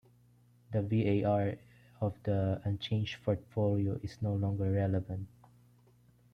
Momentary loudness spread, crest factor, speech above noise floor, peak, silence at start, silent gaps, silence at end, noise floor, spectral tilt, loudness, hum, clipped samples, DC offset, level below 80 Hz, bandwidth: 8 LU; 14 dB; 32 dB; -20 dBFS; 0.7 s; none; 1.05 s; -64 dBFS; -8.5 dB/octave; -34 LUFS; 60 Hz at -55 dBFS; under 0.1%; under 0.1%; -62 dBFS; 6.4 kHz